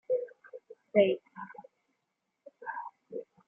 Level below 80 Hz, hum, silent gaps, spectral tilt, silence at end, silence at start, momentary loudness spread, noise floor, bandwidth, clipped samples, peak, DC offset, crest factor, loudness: -86 dBFS; none; none; -4.5 dB/octave; 0.25 s; 0.1 s; 25 LU; -83 dBFS; 3.6 kHz; under 0.1%; -10 dBFS; under 0.1%; 24 dB; -31 LUFS